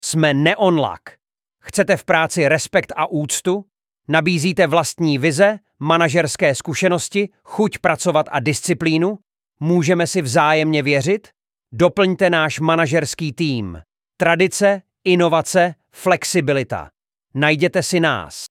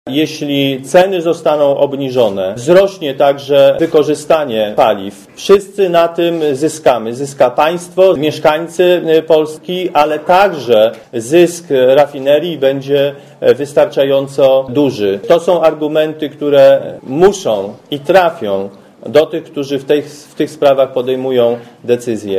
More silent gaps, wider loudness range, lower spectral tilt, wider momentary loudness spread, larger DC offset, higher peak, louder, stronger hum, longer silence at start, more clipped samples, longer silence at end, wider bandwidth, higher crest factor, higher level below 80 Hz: neither; about the same, 2 LU vs 3 LU; about the same, -4.5 dB/octave vs -5.5 dB/octave; about the same, 8 LU vs 9 LU; neither; about the same, 0 dBFS vs 0 dBFS; second, -17 LUFS vs -12 LUFS; neither; about the same, 0.05 s vs 0.05 s; second, under 0.1% vs 0.5%; about the same, 0.05 s vs 0 s; about the same, 16 kHz vs 15.5 kHz; about the same, 16 dB vs 12 dB; about the same, -54 dBFS vs -52 dBFS